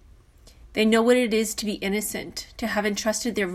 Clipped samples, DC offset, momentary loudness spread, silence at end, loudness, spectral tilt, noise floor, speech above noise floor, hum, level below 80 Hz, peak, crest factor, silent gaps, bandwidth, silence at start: under 0.1%; under 0.1%; 12 LU; 0 s; -24 LUFS; -3.5 dB/octave; -51 dBFS; 28 dB; none; -52 dBFS; -8 dBFS; 18 dB; none; 15.5 kHz; 0.65 s